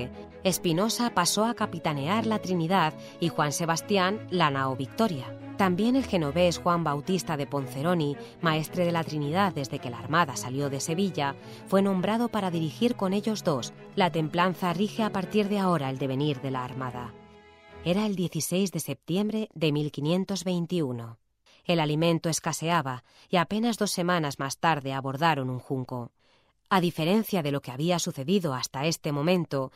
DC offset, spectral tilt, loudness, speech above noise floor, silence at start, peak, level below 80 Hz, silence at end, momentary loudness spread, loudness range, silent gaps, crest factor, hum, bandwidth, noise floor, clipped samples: under 0.1%; -5 dB/octave; -27 LUFS; 38 dB; 0 s; -8 dBFS; -62 dBFS; 0.05 s; 7 LU; 3 LU; none; 18 dB; none; 16 kHz; -65 dBFS; under 0.1%